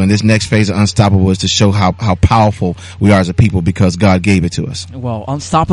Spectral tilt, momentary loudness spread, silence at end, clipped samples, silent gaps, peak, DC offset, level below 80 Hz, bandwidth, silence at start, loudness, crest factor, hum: -6 dB/octave; 10 LU; 0 s; under 0.1%; none; 0 dBFS; under 0.1%; -30 dBFS; 11.5 kHz; 0 s; -12 LUFS; 12 dB; none